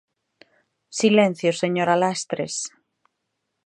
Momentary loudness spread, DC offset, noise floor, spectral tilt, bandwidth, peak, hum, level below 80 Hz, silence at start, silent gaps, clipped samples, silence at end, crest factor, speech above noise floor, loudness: 12 LU; under 0.1%; -78 dBFS; -4.5 dB/octave; 11 kHz; -4 dBFS; none; -74 dBFS; 0.9 s; none; under 0.1%; 0.95 s; 20 dB; 57 dB; -21 LUFS